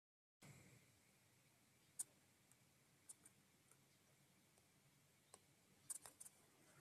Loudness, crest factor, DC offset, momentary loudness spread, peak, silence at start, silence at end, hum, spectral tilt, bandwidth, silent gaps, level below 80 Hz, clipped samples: -57 LUFS; 32 dB; under 0.1%; 16 LU; -34 dBFS; 0.4 s; 0 s; none; -1.5 dB/octave; 14 kHz; none; under -90 dBFS; under 0.1%